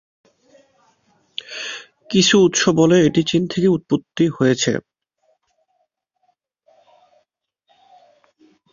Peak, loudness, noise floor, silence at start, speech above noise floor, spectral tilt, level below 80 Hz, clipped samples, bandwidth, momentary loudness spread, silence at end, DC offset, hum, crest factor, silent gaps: -2 dBFS; -17 LUFS; -70 dBFS; 1.4 s; 55 dB; -4.5 dB/octave; -58 dBFS; under 0.1%; 7.4 kHz; 16 LU; 3.95 s; under 0.1%; none; 18 dB; none